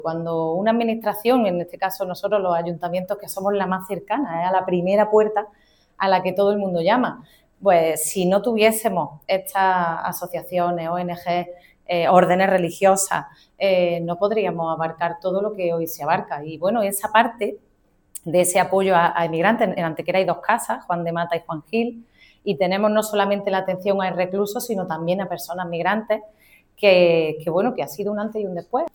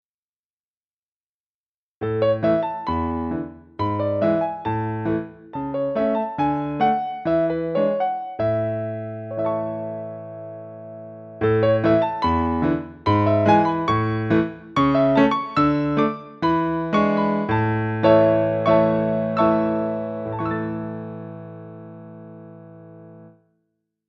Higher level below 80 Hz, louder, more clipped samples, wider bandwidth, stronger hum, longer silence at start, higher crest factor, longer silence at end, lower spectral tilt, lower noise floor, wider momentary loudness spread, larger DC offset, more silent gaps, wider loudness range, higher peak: second, -62 dBFS vs -50 dBFS; about the same, -21 LUFS vs -21 LUFS; neither; first, 19 kHz vs 6.6 kHz; neither; second, 0 s vs 2 s; about the same, 20 dB vs 20 dB; second, 0.05 s vs 0.8 s; second, -4.5 dB/octave vs -9 dB/octave; second, -43 dBFS vs under -90 dBFS; second, 9 LU vs 18 LU; neither; neither; second, 3 LU vs 8 LU; about the same, 0 dBFS vs -2 dBFS